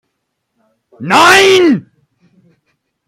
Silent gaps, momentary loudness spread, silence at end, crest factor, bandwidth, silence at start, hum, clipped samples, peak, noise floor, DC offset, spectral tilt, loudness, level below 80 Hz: none; 13 LU; 1.3 s; 12 dB; 16.5 kHz; 1 s; none; under 0.1%; 0 dBFS; -70 dBFS; under 0.1%; -3 dB/octave; -8 LUFS; -56 dBFS